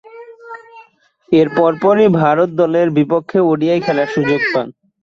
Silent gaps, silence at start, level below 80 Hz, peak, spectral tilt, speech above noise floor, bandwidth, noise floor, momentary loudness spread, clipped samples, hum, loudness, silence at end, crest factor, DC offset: none; 0.15 s; -56 dBFS; -2 dBFS; -8 dB/octave; 37 dB; 7.2 kHz; -50 dBFS; 18 LU; under 0.1%; none; -14 LUFS; 0.35 s; 14 dB; under 0.1%